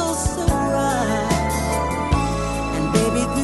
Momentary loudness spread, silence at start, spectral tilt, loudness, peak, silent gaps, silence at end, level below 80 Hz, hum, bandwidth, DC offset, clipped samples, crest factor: 4 LU; 0 s; -5 dB/octave; -21 LUFS; -4 dBFS; none; 0 s; -28 dBFS; none; 12.5 kHz; under 0.1%; under 0.1%; 16 dB